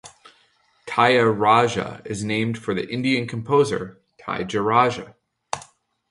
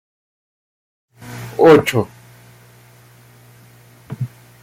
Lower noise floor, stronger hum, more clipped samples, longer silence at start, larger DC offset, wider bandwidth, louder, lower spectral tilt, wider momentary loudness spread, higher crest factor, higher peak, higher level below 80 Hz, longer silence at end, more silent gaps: first, -61 dBFS vs -46 dBFS; second, none vs 60 Hz at -45 dBFS; neither; second, 0.05 s vs 1.25 s; neither; second, 11.5 kHz vs 16 kHz; second, -21 LUFS vs -15 LUFS; about the same, -5.5 dB/octave vs -6 dB/octave; second, 16 LU vs 24 LU; about the same, 20 dB vs 20 dB; about the same, -2 dBFS vs 0 dBFS; about the same, -58 dBFS vs -56 dBFS; about the same, 0.45 s vs 0.35 s; neither